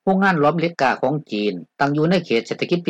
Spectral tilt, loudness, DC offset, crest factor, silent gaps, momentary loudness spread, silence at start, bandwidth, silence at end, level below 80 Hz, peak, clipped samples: -6.5 dB/octave; -20 LUFS; under 0.1%; 14 dB; none; 7 LU; 0.05 s; 8.4 kHz; 0 s; -62 dBFS; -6 dBFS; under 0.1%